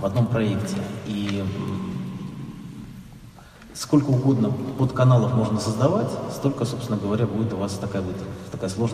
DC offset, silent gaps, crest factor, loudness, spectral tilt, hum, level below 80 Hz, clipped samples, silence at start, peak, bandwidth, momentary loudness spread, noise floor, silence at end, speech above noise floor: under 0.1%; none; 18 dB; -24 LUFS; -7 dB/octave; none; -50 dBFS; under 0.1%; 0 s; -6 dBFS; 14.5 kHz; 17 LU; -45 dBFS; 0 s; 22 dB